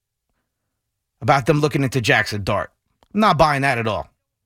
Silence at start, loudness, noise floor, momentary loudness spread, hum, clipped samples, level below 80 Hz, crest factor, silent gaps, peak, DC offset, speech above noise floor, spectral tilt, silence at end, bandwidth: 1.2 s; -19 LUFS; -77 dBFS; 12 LU; none; under 0.1%; -46 dBFS; 18 dB; none; -2 dBFS; under 0.1%; 60 dB; -5.5 dB/octave; 0.45 s; 16.5 kHz